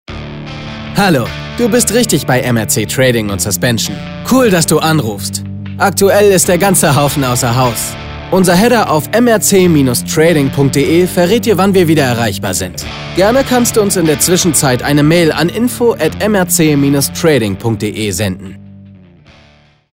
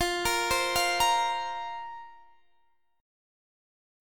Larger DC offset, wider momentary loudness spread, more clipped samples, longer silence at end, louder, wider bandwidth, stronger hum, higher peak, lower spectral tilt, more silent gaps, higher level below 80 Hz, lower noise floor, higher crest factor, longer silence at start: neither; second, 10 LU vs 16 LU; neither; about the same, 1 s vs 1 s; first, -11 LUFS vs -27 LUFS; second, 16.5 kHz vs 19 kHz; neither; first, 0 dBFS vs -14 dBFS; first, -4.5 dB/octave vs -1 dB/octave; neither; first, -36 dBFS vs -54 dBFS; second, -46 dBFS vs -72 dBFS; second, 12 dB vs 18 dB; about the same, 0.1 s vs 0 s